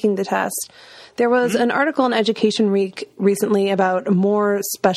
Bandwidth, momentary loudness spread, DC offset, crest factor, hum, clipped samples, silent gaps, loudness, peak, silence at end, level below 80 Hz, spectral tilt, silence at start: 15.5 kHz; 6 LU; under 0.1%; 18 dB; none; under 0.1%; none; -19 LUFS; -2 dBFS; 0 s; -64 dBFS; -5 dB/octave; 0 s